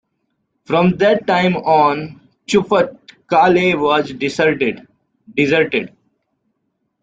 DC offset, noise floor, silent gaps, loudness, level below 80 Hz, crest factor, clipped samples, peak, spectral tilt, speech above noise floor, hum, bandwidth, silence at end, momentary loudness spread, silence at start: under 0.1%; -70 dBFS; none; -16 LUFS; -54 dBFS; 16 dB; under 0.1%; -2 dBFS; -6 dB/octave; 55 dB; none; 9 kHz; 1.15 s; 11 LU; 0.7 s